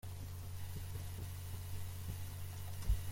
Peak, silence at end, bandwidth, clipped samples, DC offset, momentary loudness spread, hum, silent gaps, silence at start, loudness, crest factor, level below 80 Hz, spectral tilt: -24 dBFS; 0 s; 16.5 kHz; under 0.1%; under 0.1%; 5 LU; none; none; 0.05 s; -46 LUFS; 18 dB; -46 dBFS; -5 dB/octave